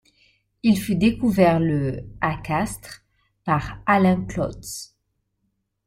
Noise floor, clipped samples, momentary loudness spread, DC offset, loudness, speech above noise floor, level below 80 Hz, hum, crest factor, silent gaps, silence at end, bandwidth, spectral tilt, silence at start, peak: -74 dBFS; under 0.1%; 16 LU; under 0.1%; -22 LUFS; 53 dB; -46 dBFS; none; 20 dB; none; 1 s; 16 kHz; -6.5 dB/octave; 0.65 s; -4 dBFS